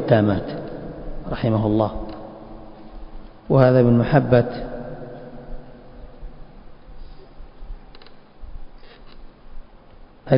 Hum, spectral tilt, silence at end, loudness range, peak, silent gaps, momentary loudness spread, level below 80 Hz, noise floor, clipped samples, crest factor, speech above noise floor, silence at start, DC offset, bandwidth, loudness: none; -11.5 dB/octave; 0 s; 19 LU; 0 dBFS; none; 27 LU; -40 dBFS; -45 dBFS; under 0.1%; 22 dB; 28 dB; 0 s; under 0.1%; 5.4 kHz; -19 LUFS